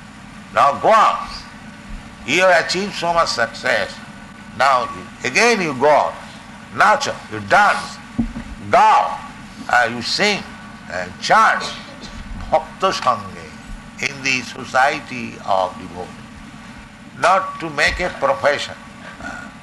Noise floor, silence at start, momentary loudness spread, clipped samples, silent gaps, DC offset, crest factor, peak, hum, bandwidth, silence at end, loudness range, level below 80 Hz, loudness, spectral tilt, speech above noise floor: -38 dBFS; 0 s; 22 LU; under 0.1%; none; under 0.1%; 16 dB; -4 dBFS; none; 12 kHz; 0 s; 5 LU; -42 dBFS; -17 LUFS; -3 dB/octave; 21 dB